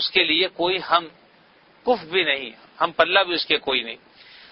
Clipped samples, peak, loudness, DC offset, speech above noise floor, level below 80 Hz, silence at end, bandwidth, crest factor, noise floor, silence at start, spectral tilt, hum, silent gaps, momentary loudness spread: under 0.1%; 0 dBFS; -21 LUFS; under 0.1%; 33 dB; -62 dBFS; 0.55 s; 5.8 kHz; 24 dB; -55 dBFS; 0 s; -7 dB/octave; none; none; 14 LU